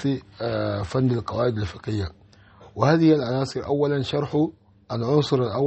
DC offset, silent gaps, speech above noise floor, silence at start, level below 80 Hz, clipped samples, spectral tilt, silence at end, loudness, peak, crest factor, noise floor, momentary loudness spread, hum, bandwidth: under 0.1%; none; 27 dB; 0 s; -50 dBFS; under 0.1%; -7.5 dB/octave; 0 s; -24 LUFS; -6 dBFS; 18 dB; -50 dBFS; 11 LU; none; 8.4 kHz